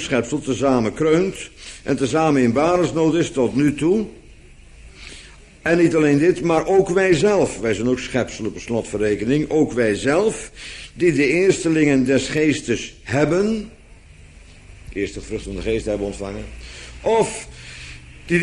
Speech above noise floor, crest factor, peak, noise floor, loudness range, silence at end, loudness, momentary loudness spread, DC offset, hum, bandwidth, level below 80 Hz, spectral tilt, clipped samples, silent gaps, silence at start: 25 dB; 16 dB; -4 dBFS; -44 dBFS; 7 LU; 0 s; -19 LUFS; 18 LU; under 0.1%; none; 11 kHz; -42 dBFS; -5.5 dB/octave; under 0.1%; none; 0 s